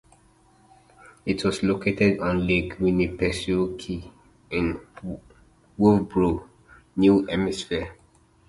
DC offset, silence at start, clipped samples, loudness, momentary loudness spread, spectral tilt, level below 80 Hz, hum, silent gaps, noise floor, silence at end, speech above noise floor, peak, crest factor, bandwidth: under 0.1%; 1.25 s; under 0.1%; -24 LUFS; 16 LU; -6.5 dB/octave; -44 dBFS; none; none; -58 dBFS; 0.55 s; 35 dB; -4 dBFS; 20 dB; 11.5 kHz